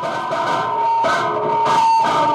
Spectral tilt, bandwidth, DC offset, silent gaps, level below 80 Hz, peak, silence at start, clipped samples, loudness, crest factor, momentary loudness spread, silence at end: -4 dB/octave; 12 kHz; under 0.1%; none; -64 dBFS; -6 dBFS; 0 s; under 0.1%; -17 LUFS; 10 dB; 6 LU; 0 s